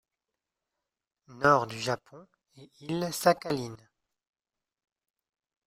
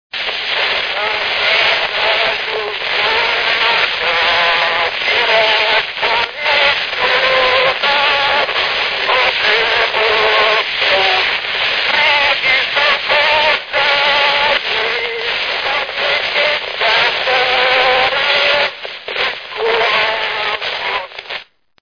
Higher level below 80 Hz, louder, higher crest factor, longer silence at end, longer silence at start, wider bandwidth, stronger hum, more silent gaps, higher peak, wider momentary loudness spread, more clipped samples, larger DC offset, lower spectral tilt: second, -68 dBFS vs -48 dBFS; second, -28 LUFS vs -13 LUFS; first, 26 dB vs 14 dB; first, 1.9 s vs 0.4 s; first, 1.3 s vs 0.15 s; first, 16 kHz vs 5.4 kHz; neither; neither; second, -8 dBFS vs 0 dBFS; first, 12 LU vs 7 LU; neither; second, under 0.1% vs 0.1%; first, -4.5 dB/octave vs -1.5 dB/octave